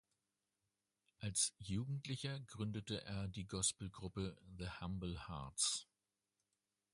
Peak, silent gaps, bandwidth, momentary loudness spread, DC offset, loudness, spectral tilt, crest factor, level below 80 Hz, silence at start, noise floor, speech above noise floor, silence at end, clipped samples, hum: -24 dBFS; none; 11.5 kHz; 10 LU; under 0.1%; -43 LUFS; -3.5 dB/octave; 22 dB; -62 dBFS; 1.2 s; under -90 dBFS; over 46 dB; 1.1 s; under 0.1%; none